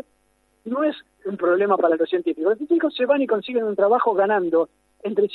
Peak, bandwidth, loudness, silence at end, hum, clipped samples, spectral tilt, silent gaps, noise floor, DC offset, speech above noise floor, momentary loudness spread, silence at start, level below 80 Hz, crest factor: -6 dBFS; 4.5 kHz; -21 LUFS; 0 s; none; under 0.1%; -7.5 dB/octave; none; -65 dBFS; under 0.1%; 44 dB; 11 LU; 0.65 s; -70 dBFS; 16 dB